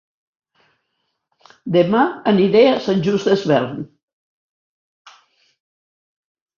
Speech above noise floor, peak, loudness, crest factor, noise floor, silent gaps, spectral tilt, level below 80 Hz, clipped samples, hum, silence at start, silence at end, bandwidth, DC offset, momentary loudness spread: 57 dB; -2 dBFS; -16 LUFS; 18 dB; -73 dBFS; none; -7 dB/octave; -62 dBFS; under 0.1%; none; 1.65 s; 2.75 s; 7.2 kHz; under 0.1%; 16 LU